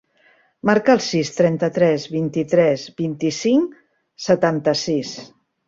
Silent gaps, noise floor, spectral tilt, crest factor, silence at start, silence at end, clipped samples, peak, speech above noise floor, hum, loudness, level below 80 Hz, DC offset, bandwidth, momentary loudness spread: none; -57 dBFS; -5.5 dB/octave; 18 dB; 0.65 s; 0.4 s; under 0.1%; -2 dBFS; 39 dB; none; -19 LUFS; -60 dBFS; under 0.1%; 7.8 kHz; 8 LU